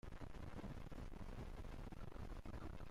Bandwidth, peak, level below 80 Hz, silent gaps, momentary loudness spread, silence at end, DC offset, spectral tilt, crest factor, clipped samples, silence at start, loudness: 15.5 kHz; -42 dBFS; -54 dBFS; none; 2 LU; 0 s; under 0.1%; -7 dB/octave; 8 dB; under 0.1%; 0.05 s; -55 LUFS